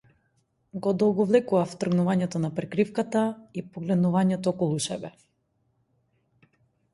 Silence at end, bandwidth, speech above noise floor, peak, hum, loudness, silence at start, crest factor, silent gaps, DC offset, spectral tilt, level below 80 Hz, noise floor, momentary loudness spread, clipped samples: 1.85 s; 11.5 kHz; 47 dB; -8 dBFS; none; -26 LUFS; 0.75 s; 18 dB; none; under 0.1%; -6.5 dB/octave; -66 dBFS; -72 dBFS; 13 LU; under 0.1%